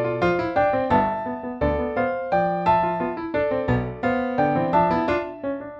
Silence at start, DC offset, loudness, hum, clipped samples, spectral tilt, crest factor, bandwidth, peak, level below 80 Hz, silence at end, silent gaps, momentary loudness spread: 0 s; under 0.1%; -23 LUFS; none; under 0.1%; -8.5 dB/octave; 16 dB; 7.8 kHz; -6 dBFS; -42 dBFS; 0 s; none; 6 LU